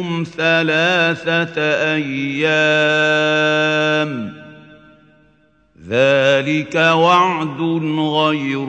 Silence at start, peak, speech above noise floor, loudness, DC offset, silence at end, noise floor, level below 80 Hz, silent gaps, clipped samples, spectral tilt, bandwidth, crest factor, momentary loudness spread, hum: 0 s; 0 dBFS; 40 dB; -15 LUFS; under 0.1%; 0 s; -56 dBFS; -62 dBFS; none; under 0.1%; -5 dB/octave; 9 kHz; 16 dB; 7 LU; none